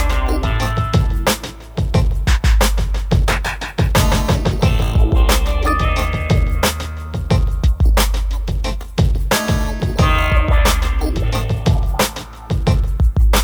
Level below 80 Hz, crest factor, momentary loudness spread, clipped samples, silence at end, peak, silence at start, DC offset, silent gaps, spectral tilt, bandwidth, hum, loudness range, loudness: -18 dBFS; 12 dB; 7 LU; under 0.1%; 0 s; -2 dBFS; 0 s; under 0.1%; none; -5 dB/octave; over 20 kHz; none; 2 LU; -17 LUFS